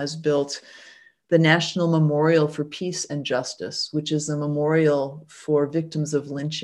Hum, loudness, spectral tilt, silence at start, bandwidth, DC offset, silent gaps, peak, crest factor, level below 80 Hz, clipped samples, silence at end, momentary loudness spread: none; -23 LUFS; -5.5 dB/octave; 0 s; 11 kHz; under 0.1%; none; -2 dBFS; 20 dB; -68 dBFS; under 0.1%; 0 s; 10 LU